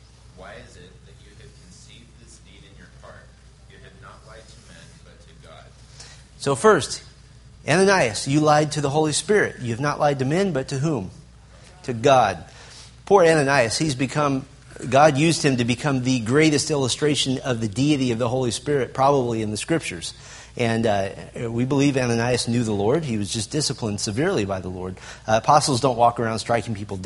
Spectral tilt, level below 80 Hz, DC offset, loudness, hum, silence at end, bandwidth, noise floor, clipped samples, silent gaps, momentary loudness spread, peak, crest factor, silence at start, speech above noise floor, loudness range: -5 dB/octave; -50 dBFS; under 0.1%; -21 LUFS; none; 0 s; 11.5 kHz; -47 dBFS; under 0.1%; none; 16 LU; -2 dBFS; 22 dB; 0.35 s; 25 dB; 4 LU